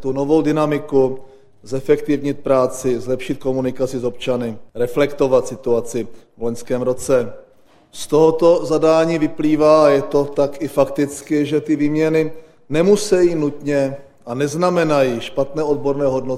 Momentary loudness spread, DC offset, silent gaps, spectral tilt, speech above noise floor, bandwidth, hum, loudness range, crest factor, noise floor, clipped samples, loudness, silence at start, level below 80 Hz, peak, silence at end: 10 LU; under 0.1%; none; -6 dB/octave; 34 dB; 15 kHz; none; 5 LU; 16 dB; -50 dBFS; under 0.1%; -18 LUFS; 0 s; -46 dBFS; 0 dBFS; 0 s